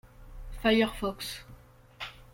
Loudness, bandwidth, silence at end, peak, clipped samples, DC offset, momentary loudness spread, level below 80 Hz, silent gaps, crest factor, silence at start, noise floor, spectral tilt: -29 LUFS; 16.5 kHz; 0.1 s; -12 dBFS; under 0.1%; under 0.1%; 21 LU; -48 dBFS; none; 20 dB; 0.05 s; -53 dBFS; -4.5 dB/octave